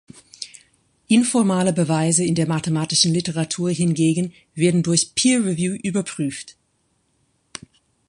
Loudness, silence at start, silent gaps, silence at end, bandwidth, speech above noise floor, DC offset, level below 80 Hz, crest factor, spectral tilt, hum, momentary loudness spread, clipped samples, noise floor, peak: -19 LUFS; 0.4 s; none; 1.6 s; 11 kHz; 47 dB; under 0.1%; -58 dBFS; 18 dB; -4.5 dB/octave; none; 18 LU; under 0.1%; -67 dBFS; -2 dBFS